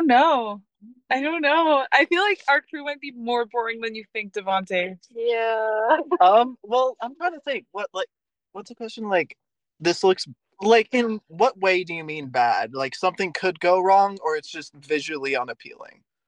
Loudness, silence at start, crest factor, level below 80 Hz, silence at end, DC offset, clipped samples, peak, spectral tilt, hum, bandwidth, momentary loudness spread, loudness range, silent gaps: -22 LUFS; 0 s; 20 dB; -78 dBFS; 0.45 s; under 0.1%; under 0.1%; -4 dBFS; -4 dB/octave; none; 10 kHz; 15 LU; 5 LU; none